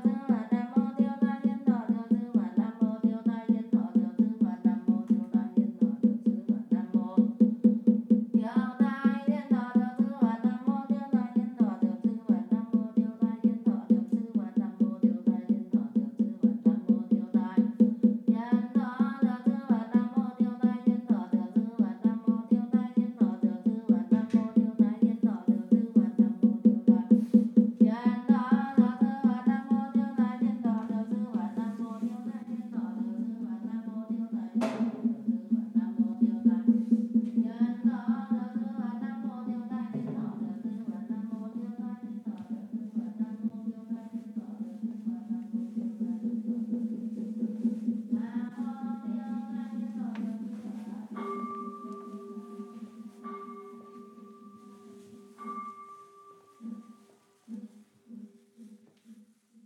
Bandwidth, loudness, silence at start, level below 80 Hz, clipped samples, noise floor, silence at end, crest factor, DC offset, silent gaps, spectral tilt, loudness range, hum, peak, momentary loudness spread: 4.3 kHz; -29 LUFS; 0 s; under -90 dBFS; under 0.1%; -62 dBFS; 0.5 s; 20 dB; under 0.1%; none; -9.5 dB/octave; 16 LU; none; -10 dBFS; 14 LU